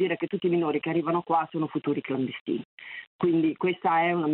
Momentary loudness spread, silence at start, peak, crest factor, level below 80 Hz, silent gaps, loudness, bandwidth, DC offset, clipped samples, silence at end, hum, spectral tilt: 9 LU; 0 s; -12 dBFS; 14 dB; -74 dBFS; 2.41-2.46 s, 2.65-2.78 s, 3.07-3.19 s; -27 LUFS; 4.2 kHz; under 0.1%; under 0.1%; 0 s; none; -10 dB/octave